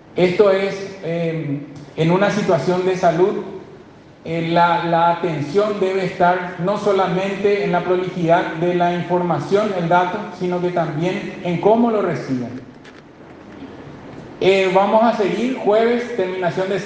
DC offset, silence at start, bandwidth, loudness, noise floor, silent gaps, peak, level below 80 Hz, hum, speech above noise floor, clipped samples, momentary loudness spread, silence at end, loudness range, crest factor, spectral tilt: under 0.1%; 0.15 s; 9 kHz; -18 LUFS; -43 dBFS; none; -2 dBFS; -58 dBFS; none; 25 dB; under 0.1%; 12 LU; 0 s; 3 LU; 18 dB; -7 dB/octave